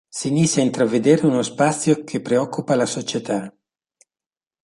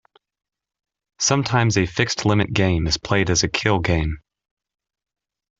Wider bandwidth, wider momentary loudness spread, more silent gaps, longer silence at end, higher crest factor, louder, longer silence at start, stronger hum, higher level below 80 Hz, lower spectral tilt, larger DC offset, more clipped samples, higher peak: first, 11.5 kHz vs 8 kHz; first, 9 LU vs 4 LU; neither; second, 1.15 s vs 1.4 s; about the same, 18 dB vs 20 dB; about the same, -20 LUFS vs -20 LUFS; second, 0.15 s vs 1.2 s; neither; second, -62 dBFS vs -40 dBFS; about the same, -5 dB/octave vs -4 dB/octave; neither; neither; about the same, -2 dBFS vs -2 dBFS